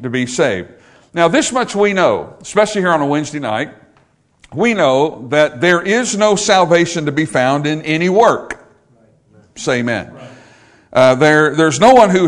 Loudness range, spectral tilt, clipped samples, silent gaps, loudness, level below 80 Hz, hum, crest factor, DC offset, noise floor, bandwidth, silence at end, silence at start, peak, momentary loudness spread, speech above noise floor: 4 LU; -4.5 dB/octave; 0.3%; none; -13 LUFS; -52 dBFS; none; 14 dB; under 0.1%; -54 dBFS; 12 kHz; 0 s; 0 s; 0 dBFS; 11 LU; 41 dB